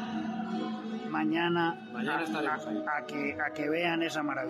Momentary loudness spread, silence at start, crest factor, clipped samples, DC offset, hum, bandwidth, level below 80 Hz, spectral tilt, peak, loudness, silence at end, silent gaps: 6 LU; 0 s; 14 dB; under 0.1%; under 0.1%; none; 14 kHz; -78 dBFS; -5.5 dB/octave; -18 dBFS; -32 LUFS; 0 s; none